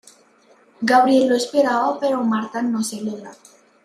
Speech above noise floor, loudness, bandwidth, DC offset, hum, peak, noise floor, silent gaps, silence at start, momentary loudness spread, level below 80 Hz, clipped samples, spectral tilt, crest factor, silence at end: 35 dB; -19 LUFS; 15 kHz; under 0.1%; none; -4 dBFS; -54 dBFS; none; 0.8 s; 12 LU; -70 dBFS; under 0.1%; -4 dB/octave; 16 dB; 0.5 s